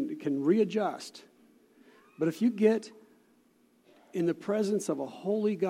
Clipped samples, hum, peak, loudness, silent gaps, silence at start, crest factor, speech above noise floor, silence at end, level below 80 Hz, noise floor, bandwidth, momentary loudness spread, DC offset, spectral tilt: under 0.1%; none; -12 dBFS; -30 LUFS; none; 0 s; 18 dB; 37 dB; 0 s; -86 dBFS; -66 dBFS; 15.5 kHz; 11 LU; under 0.1%; -6.5 dB/octave